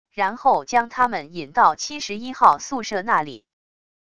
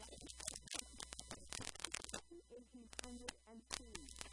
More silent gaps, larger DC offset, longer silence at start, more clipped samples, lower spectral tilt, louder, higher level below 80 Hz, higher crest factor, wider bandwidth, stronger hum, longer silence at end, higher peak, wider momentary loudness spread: neither; first, 0.5% vs under 0.1%; first, 0.15 s vs 0 s; neither; first, -3 dB/octave vs -1.5 dB/octave; first, -21 LUFS vs -50 LUFS; about the same, -60 dBFS vs -64 dBFS; second, 22 dB vs 32 dB; about the same, 11 kHz vs 11.5 kHz; neither; first, 0.8 s vs 0 s; first, 0 dBFS vs -20 dBFS; about the same, 12 LU vs 13 LU